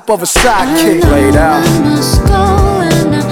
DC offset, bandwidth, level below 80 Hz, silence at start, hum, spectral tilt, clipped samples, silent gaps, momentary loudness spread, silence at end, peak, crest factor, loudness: under 0.1%; over 20 kHz; -18 dBFS; 0.05 s; none; -5 dB/octave; under 0.1%; none; 2 LU; 0 s; 0 dBFS; 8 dB; -9 LUFS